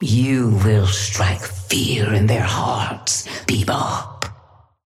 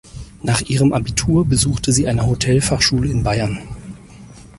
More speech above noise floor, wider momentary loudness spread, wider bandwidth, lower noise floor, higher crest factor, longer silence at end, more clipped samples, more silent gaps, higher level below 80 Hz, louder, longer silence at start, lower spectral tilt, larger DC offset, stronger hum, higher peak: first, 32 dB vs 23 dB; second, 9 LU vs 15 LU; first, 15 kHz vs 11.5 kHz; first, -50 dBFS vs -40 dBFS; about the same, 16 dB vs 16 dB; first, 0.55 s vs 0.1 s; neither; neither; second, -46 dBFS vs -32 dBFS; about the same, -19 LUFS vs -17 LUFS; second, 0 s vs 0.15 s; about the same, -4.5 dB/octave vs -4.5 dB/octave; neither; neither; about the same, -4 dBFS vs -2 dBFS